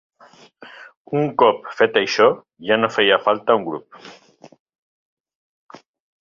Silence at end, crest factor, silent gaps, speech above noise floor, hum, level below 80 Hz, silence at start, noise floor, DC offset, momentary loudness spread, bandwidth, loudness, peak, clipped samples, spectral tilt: 2.1 s; 20 dB; 0.97-1.05 s; 30 dB; none; -66 dBFS; 0.6 s; -48 dBFS; under 0.1%; 10 LU; 7.2 kHz; -18 LUFS; 0 dBFS; under 0.1%; -4.5 dB/octave